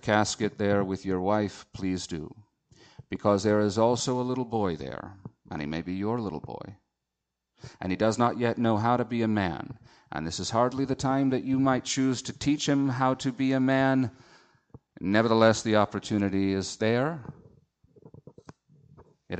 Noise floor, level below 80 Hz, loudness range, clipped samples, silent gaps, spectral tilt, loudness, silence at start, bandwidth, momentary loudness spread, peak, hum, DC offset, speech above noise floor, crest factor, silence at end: -85 dBFS; -58 dBFS; 6 LU; under 0.1%; none; -5.5 dB/octave; -27 LUFS; 0.05 s; 9 kHz; 15 LU; -8 dBFS; none; under 0.1%; 58 dB; 20 dB; 0 s